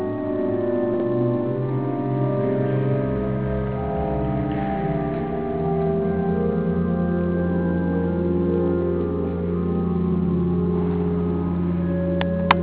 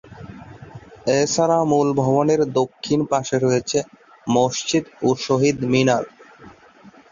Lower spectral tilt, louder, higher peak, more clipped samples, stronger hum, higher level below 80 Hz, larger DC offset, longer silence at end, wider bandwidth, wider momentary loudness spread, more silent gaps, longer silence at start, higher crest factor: first, -12.5 dB/octave vs -5 dB/octave; second, -23 LUFS vs -20 LUFS; about the same, -2 dBFS vs -4 dBFS; neither; neither; first, -36 dBFS vs -56 dBFS; first, 0.5% vs under 0.1%; second, 0 s vs 0.25 s; second, 4 kHz vs 7.6 kHz; second, 3 LU vs 20 LU; neither; about the same, 0 s vs 0.1 s; about the same, 20 dB vs 16 dB